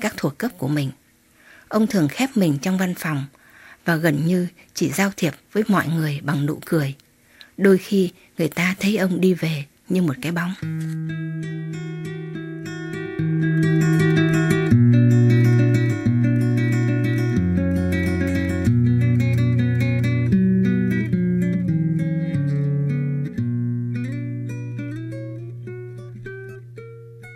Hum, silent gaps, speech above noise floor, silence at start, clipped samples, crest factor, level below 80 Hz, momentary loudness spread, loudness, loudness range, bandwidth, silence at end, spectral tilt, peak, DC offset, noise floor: none; none; 33 dB; 0 s; under 0.1%; 18 dB; -48 dBFS; 14 LU; -21 LUFS; 9 LU; 16.5 kHz; 0 s; -7 dB/octave; -4 dBFS; under 0.1%; -54 dBFS